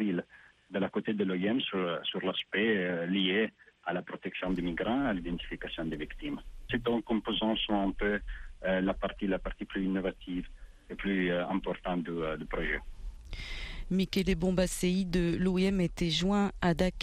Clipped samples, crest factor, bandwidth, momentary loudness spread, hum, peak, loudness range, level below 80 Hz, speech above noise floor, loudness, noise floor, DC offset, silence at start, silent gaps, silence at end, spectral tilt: under 0.1%; 16 dB; 14 kHz; 11 LU; none; -16 dBFS; 4 LU; -46 dBFS; 26 dB; -32 LUFS; -58 dBFS; under 0.1%; 0 s; none; 0 s; -5.5 dB/octave